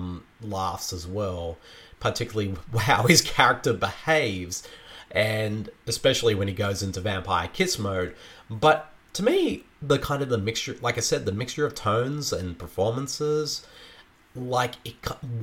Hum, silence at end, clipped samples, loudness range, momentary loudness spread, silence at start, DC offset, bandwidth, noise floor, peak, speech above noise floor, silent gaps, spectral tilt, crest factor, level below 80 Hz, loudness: none; 0 s; under 0.1%; 5 LU; 13 LU; 0 s; under 0.1%; 19 kHz; -52 dBFS; -2 dBFS; 27 dB; none; -4 dB/octave; 24 dB; -50 dBFS; -25 LUFS